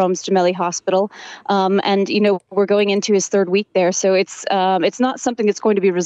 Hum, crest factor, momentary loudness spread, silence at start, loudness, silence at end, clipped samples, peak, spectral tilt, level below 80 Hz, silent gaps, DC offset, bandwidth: none; 12 dB; 4 LU; 0 s; -17 LUFS; 0 s; under 0.1%; -4 dBFS; -4.5 dB/octave; -72 dBFS; none; under 0.1%; 8.4 kHz